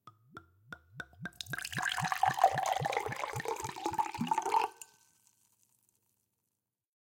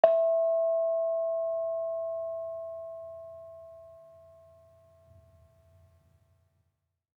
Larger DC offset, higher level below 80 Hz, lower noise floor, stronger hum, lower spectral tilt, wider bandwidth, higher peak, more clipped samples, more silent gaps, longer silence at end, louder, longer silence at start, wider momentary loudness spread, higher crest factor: neither; first, -70 dBFS vs -76 dBFS; first, -87 dBFS vs -80 dBFS; neither; second, -3.5 dB/octave vs -6.5 dB/octave; first, 17 kHz vs 4.1 kHz; second, -12 dBFS vs -6 dBFS; neither; neither; second, 2.15 s vs 3.1 s; second, -34 LUFS vs -30 LUFS; about the same, 0.05 s vs 0.05 s; about the same, 23 LU vs 22 LU; about the same, 24 dB vs 26 dB